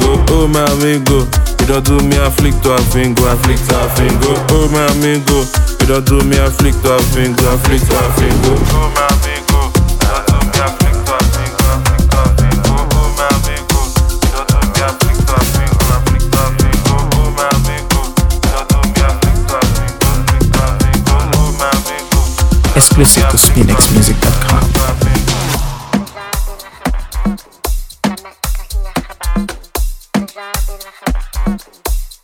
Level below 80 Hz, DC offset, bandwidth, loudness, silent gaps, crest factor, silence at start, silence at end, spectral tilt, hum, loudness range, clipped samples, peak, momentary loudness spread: -14 dBFS; under 0.1%; over 20 kHz; -12 LUFS; none; 10 dB; 0 s; 0.1 s; -4.5 dB/octave; none; 11 LU; 0.2%; 0 dBFS; 10 LU